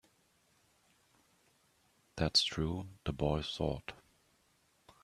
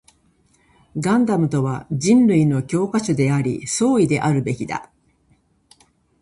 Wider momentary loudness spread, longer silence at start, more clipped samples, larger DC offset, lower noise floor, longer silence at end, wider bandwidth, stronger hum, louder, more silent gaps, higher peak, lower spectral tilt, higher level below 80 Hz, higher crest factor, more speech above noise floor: first, 14 LU vs 10 LU; first, 2.15 s vs 0.95 s; neither; neither; first, -73 dBFS vs -60 dBFS; second, 1.1 s vs 1.4 s; first, 13.5 kHz vs 11.5 kHz; neither; second, -35 LUFS vs -19 LUFS; neither; second, -16 dBFS vs -4 dBFS; second, -4.5 dB/octave vs -6.5 dB/octave; about the same, -54 dBFS vs -54 dBFS; first, 24 dB vs 16 dB; second, 38 dB vs 42 dB